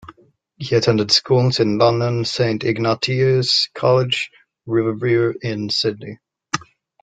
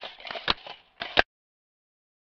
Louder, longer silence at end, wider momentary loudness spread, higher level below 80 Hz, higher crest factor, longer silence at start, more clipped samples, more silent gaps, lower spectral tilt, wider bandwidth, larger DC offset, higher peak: first, -18 LUFS vs -28 LUFS; second, 0.4 s vs 1 s; about the same, 12 LU vs 13 LU; about the same, -56 dBFS vs -52 dBFS; second, 18 dB vs 32 dB; about the same, 0.05 s vs 0 s; neither; neither; first, -5.5 dB/octave vs 1 dB/octave; first, 9.2 kHz vs 6.8 kHz; neither; about the same, -2 dBFS vs 0 dBFS